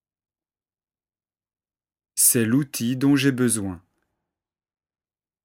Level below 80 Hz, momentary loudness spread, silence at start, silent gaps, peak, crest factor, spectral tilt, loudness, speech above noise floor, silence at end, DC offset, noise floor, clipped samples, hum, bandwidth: -66 dBFS; 10 LU; 2.15 s; none; -4 dBFS; 22 dB; -4 dB/octave; -20 LUFS; over 69 dB; 1.65 s; under 0.1%; under -90 dBFS; under 0.1%; none; 17 kHz